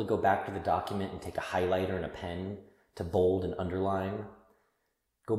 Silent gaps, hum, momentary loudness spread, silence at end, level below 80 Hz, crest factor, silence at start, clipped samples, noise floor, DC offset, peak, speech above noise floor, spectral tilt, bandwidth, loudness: none; none; 13 LU; 0 s; -56 dBFS; 20 dB; 0 s; under 0.1%; -80 dBFS; under 0.1%; -14 dBFS; 48 dB; -7 dB/octave; 15.5 kHz; -32 LUFS